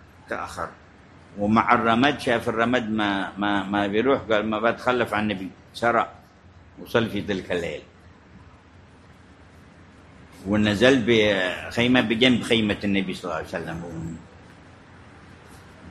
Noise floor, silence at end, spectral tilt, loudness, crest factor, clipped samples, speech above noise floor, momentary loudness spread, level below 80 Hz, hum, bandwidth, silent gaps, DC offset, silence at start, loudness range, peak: -50 dBFS; 0 s; -5.5 dB/octave; -23 LUFS; 22 dB; under 0.1%; 27 dB; 16 LU; -50 dBFS; none; 13 kHz; none; under 0.1%; 0.3 s; 10 LU; -2 dBFS